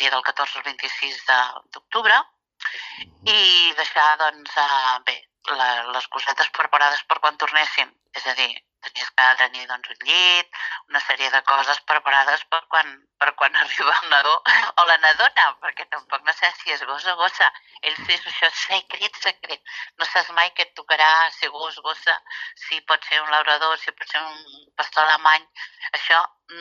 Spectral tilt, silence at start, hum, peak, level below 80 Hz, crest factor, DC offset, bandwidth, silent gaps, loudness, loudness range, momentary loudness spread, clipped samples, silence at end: 1 dB/octave; 0 s; none; -4 dBFS; -76 dBFS; 18 dB; under 0.1%; 7.6 kHz; none; -19 LUFS; 4 LU; 13 LU; under 0.1%; 0 s